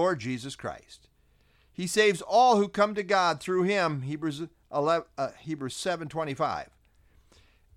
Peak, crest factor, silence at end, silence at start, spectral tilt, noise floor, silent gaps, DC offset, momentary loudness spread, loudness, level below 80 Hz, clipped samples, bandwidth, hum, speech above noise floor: -10 dBFS; 18 dB; 1.15 s; 0 s; -4.5 dB/octave; -64 dBFS; none; under 0.1%; 15 LU; -27 LUFS; -64 dBFS; under 0.1%; 15.5 kHz; none; 37 dB